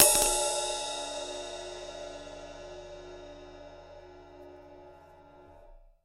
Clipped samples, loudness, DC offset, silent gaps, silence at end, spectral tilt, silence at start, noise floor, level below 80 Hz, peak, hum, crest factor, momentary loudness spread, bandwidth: under 0.1%; -30 LUFS; under 0.1%; none; 0.25 s; -0.5 dB/octave; 0 s; -54 dBFS; -52 dBFS; 0 dBFS; none; 32 dB; 24 LU; 16 kHz